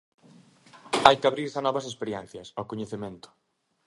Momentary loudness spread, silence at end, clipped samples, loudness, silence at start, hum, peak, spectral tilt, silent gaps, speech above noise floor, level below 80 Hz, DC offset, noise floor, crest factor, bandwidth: 18 LU; 0.7 s; under 0.1%; -26 LUFS; 0.75 s; none; 0 dBFS; -4 dB/octave; none; 29 dB; -62 dBFS; under 0.1%; -56 dBFS; 28 dB; 11.5 kHz